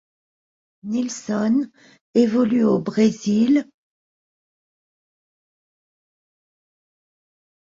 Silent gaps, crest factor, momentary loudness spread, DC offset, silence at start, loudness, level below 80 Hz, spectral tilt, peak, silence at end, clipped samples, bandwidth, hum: 2.01-2.13 s; 18 dB; 8 LU; under 0.1%; 0.85 s; -20 LUFS; -66 dBFS; -6.5 dB/octave; -6 dBFS; 4.1 s; under 0.1%; 7.8 kHz; none